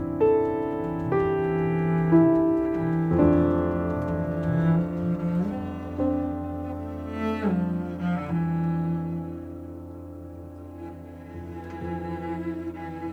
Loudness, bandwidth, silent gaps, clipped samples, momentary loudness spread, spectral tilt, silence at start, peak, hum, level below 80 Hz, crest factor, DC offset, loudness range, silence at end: -26 LUFS; 4.7 kHz; none; under 0.1%; 19 LU; -10 dB/octave; 0 s; -6 dBFS; none; -46 dBFS; 18 dB; under 0.1%; 13 LU; 0 s